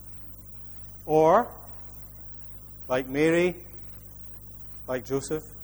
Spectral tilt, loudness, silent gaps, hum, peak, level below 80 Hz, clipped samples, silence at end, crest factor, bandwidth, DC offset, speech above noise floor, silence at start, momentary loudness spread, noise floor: -6 dB/octave; -25 LUFS; none; 50 Hz at -50 dBFS; -8 dBFS; -50 dBFS; under 0.1%; 0 s; 20 dB; over 20 kHz; under 0.1%; 19 dB; 0 s; 19 LU; -43 dBFS